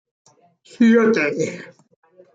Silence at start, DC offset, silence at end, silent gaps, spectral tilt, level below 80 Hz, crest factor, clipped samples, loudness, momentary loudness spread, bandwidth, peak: 0.8 s; under 0.1%; 0.7 s; none; -6 dB/octave; -68 dBFS; 16 dB; under 0.1%; -17 LUFS; 13 LU; 7.8 kHz; -4 dBFS